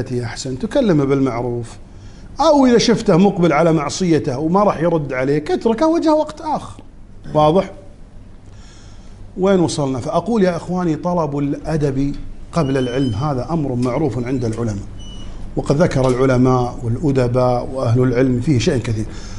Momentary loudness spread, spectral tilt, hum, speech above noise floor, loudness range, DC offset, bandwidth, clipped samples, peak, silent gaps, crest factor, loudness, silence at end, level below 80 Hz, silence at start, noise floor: 11 LU; -6.5 dB/octave; none; 21 dB; 5 LU; under 0.1%; 11.5 kHz; under 0.1%; 0 dBFS; none; 16 dB; -17 LUFS; 0 s; -34 dBFS; 0 s; -37 dBFS